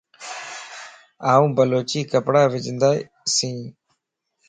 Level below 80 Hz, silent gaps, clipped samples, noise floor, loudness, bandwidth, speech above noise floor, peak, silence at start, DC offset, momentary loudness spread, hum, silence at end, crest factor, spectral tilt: -64 dBFS; none; under 0.1%; -75 dBFS; -20 LUFS; 9.6 kHz; 56 dB; -2 dBFS; 0.2 s; under 0.1%; 17 LU; none; 0.75 s; 20 dB; -4.5 dB/octave